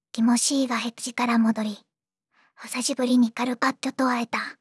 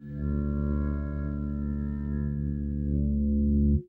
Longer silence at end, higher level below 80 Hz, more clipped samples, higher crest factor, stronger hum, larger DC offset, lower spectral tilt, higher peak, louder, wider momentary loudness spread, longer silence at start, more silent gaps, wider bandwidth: about the same, 0.1 s vs 0.05 s; second, -84 dBFS vs -32 dBFS; neither; about the same, 16 dB vs 14 dB; neither; neither; second, -3 dB/octave vs -13 dB/octave; first, -8 dBFS vs -14 dBFS; first, -24 LUFS vs -30 LUFS; about the same, 9 LU vs 7 LU; first, 0.15 s vs 0 s; neither; first, 12 kHz vs 1.9 kHz